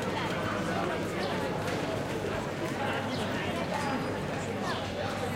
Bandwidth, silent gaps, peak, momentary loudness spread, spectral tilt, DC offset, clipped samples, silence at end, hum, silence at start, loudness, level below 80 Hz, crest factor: 16.5 kHz; none; -18 dBFS; 2 LU; -5 dB/octave; under 0.1%; under 0.1%; 0 s; none; 0 s; -32 LUFS; -54 dBFS; 14 dB